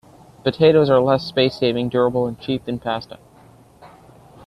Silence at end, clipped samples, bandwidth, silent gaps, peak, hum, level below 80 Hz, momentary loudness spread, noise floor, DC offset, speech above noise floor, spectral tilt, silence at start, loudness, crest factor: 0.6 s; under 0.1%; 11 kHz; none; -2 dBFS; none; -54 dBFS; 11 LU; -48 dBFS; under 0.1%; 30 dB; -7.5 dB/octave; 0.45 s; -19 LUFS; 18 dB